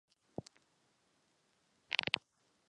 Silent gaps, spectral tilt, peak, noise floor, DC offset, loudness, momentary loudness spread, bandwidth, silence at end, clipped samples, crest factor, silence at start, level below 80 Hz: none; -3 dB/octave; -10 dBFS; -76 dBFS; under 0.1%; -37 LUFS; 16 LU; 10.5 kHz; 0.6 s; under 0.1%; 36 dB; 1.9 s; -76 dBFS